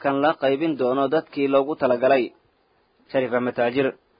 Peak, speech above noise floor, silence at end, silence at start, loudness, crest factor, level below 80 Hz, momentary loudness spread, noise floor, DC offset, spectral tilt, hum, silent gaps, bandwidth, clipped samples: -6 dBFS; 43 dB; 0.3 s; 0 s; -22 LUFS; 16 dB; -66 dBFS; 5 LU; -64 dBFS; under 0.1%; -10.5 dB/octave; none; none; 5.2 kHz; under 0.1%